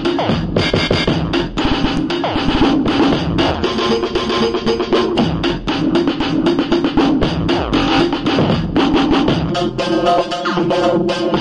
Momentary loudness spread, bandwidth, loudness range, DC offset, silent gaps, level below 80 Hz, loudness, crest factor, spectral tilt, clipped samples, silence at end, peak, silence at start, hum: 3 LU; 10.5 kHz; 1 LU; under 0.1%; none; -32 dBFS; -16 LUFS; 14 dB; -6 dB/octave; under 0.1%; 0 s; 0 dBFS; 0 s; none